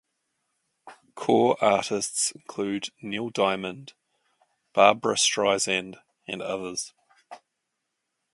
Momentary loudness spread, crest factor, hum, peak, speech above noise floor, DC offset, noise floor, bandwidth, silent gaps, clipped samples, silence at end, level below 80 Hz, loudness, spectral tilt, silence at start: 16 LU; 26 dB; none; -2 dBFS; 56 dB; under 0.1%; -81 dBFS; 11.5 kHz; none; under 0.1%; 0.95 s; -70 dBFS; -25 LUFS; -2.5 dB/octave; 0.85 s